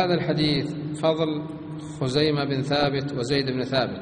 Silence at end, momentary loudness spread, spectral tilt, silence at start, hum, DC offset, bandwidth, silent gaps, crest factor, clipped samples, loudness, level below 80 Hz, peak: 0 s; 9 LU; -6 dB/octave; 0 s; none; under 0.1%; 10 kHz; none; 16 dB; under 0.1%; -24 LUFS; -54 dBFS; -8 dBFS